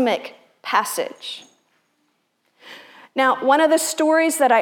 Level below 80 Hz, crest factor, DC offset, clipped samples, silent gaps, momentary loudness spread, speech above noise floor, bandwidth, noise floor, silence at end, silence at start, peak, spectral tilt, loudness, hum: -88 dBFS; 18 dB; under 0.1%; under 0.1%; none; 22 LU; 50 dB; 18.5 kHz; -68 dBFS; 0 s; 0 s; -4 dBFS; -1.5 dB/octave; -19 LUFS; none